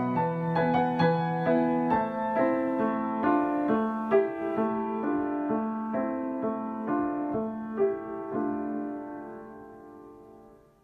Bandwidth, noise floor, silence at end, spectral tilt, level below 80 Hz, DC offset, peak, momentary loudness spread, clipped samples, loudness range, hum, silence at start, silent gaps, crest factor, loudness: 5.6 kHz; -54 dBFS; 0.35 s; -9.5 dB/octave; -64 dBFS; under 0.1%; -12 dBFS; 13 LU; under 0.1%; 6 LU; none; 0 s; none; 16 dB; -28 LUFS